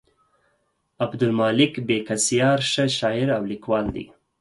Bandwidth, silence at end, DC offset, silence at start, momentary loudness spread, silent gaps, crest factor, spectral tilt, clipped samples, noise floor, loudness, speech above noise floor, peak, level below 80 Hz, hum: 11.5 kHz; 0.35 s; under 0.1%; 1 s; 10 LU; none; 18 dB; -4 dB/octave; under 0.1%; -70 dBFS; -22 LUFS; 48 dB; -4 dBFS; -52 dBFS; none